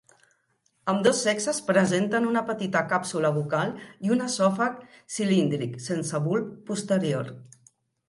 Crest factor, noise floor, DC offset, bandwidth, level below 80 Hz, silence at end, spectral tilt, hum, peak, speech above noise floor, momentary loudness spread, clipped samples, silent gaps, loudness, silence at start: 20 dB; -70 dBFS; under 0.1%; 11.5 kHz; -70 dBFS; 0.6 s; -5 dB/octave; none; -8 dBFS; 45 dB; 10 LU; under 0.1%; none; -26 LUFS; 0.85 s